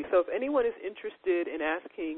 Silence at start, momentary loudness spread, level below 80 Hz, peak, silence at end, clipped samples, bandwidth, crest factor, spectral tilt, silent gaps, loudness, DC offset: 0 s; 9 LU; -64 dBFS; -14 dBFS; 0 s; under 0.1%; 4.1 kHz; 16 dB; -8 dB/octave; none; -31 LUFS; under 0.1%